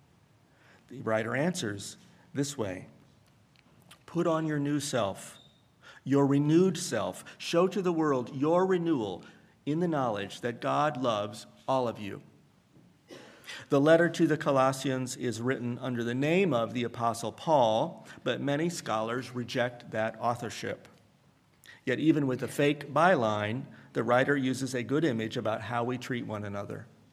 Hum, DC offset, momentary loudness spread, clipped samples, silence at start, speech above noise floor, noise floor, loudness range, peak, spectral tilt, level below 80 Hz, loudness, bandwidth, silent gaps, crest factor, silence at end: none; under 0.1%; 14 LU; under 0.1%; 0.9 s; 35 dB; -64 dBFS; 6 LU; -8 dBFS; -5.5 dB/octave; -74 dBFS; -30 LUFS; 15 kHz; none; 22 dB; 0.25 s